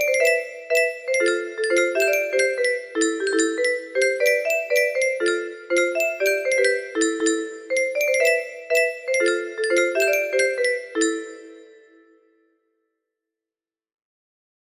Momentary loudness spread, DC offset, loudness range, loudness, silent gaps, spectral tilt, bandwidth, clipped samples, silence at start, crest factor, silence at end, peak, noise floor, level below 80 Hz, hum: 5 LU; under 0.1%; 4 LU; -21 LUFS; none; -0.5 dB/octave; 14.5 kHz; under 0.1%; 0 s; 16 dB; 3.05 s; -6 dBFS; under -90 dBFS; -72 dBFS; none